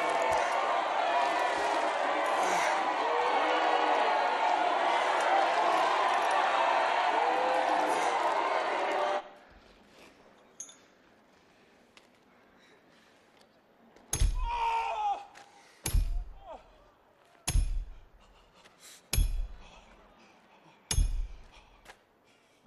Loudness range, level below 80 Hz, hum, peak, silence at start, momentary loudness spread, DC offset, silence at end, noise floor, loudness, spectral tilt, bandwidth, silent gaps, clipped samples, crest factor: 12 LU; -40 dBFS; none; -14 dBFS; 0 s; 16 LU; under 0.1%; 0.75 s; -65 dBFS; -29 LUFS; -3.5 dB/octave; 13.5 kHz; none; under 0.1%; 16 dB